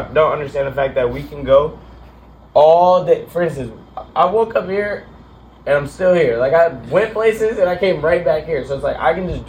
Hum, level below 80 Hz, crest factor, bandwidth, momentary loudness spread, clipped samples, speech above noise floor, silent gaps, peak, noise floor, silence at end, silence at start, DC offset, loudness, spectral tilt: none; -40 dBFS; 16 dB; 15.5 kHz; 11 LU; under 0.1%; 26 dB; none; 0 dBFS; -42 dBFS; 0 s; 0 s; under 0.1%; -16 LUFS; -6.5 dB/octave